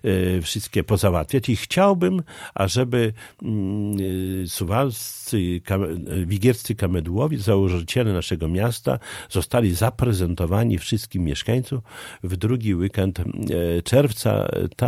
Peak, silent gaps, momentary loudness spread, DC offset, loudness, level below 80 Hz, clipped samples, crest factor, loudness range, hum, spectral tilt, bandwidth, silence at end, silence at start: -4 dBFS; none; 7 LU; under 0.1%; -22 LUFS; -40 dBFS; under 0.1%; 18 dB; 3 LU; none; -6 dB/octave; 16 kHz; 0 s; 0.05 s